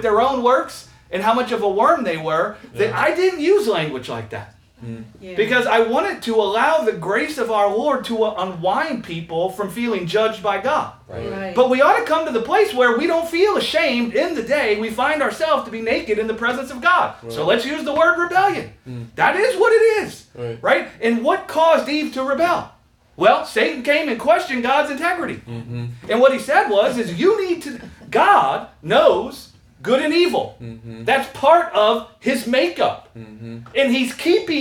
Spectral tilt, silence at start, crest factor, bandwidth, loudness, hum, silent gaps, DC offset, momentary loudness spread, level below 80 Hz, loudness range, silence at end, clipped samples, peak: -4.5 dB/octave; 0 s; 18 dB; 18 kHz; -18 LUFS; none; none; under 0.1%; 14 LU; -54 dBFS; 3 LU; 0 s; under 0.1%; 0 dBFS